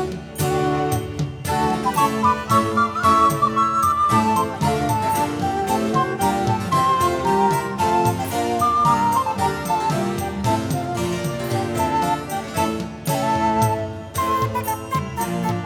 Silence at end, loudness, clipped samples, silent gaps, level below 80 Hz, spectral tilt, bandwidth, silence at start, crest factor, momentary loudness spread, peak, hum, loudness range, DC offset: 0 s; -20 LUFS; under 0.1%; none; -44 dBFS; -5.5 dB/octave; over 20 kHz; 0 s; 16 dB; 7 LU; -4 dBFS; none; 4 LU; under 0.1%